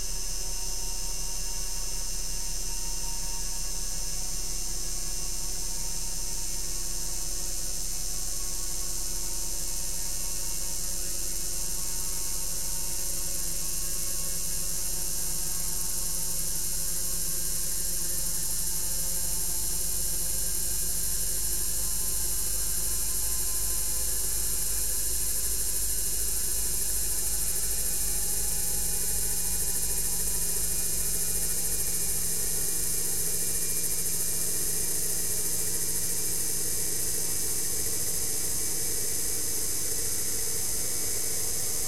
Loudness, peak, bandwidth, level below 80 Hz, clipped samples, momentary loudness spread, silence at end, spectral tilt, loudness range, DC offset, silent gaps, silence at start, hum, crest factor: -28 LUFS; -14 dBFS; 16.5 kHz; -40 dBFS; under 0.1%; 5 LU; 0 s; -1 dB/octave; 5 LU; 3%; none; 0 s; none; 16 dB